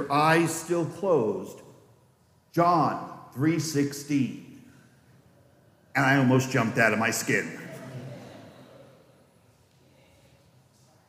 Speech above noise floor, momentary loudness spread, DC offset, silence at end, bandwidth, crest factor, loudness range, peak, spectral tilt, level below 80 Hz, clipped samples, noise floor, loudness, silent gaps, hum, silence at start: 38 dB; 19 LU; under 0.1%; 2.45 s; 15.5 kHz; 20 dB; 7 LU; -8 dBFS; -5 dB/octave; -72 dBFS; under 0.1%; -62 dBFS; -25 LUFS; none; none; 0 s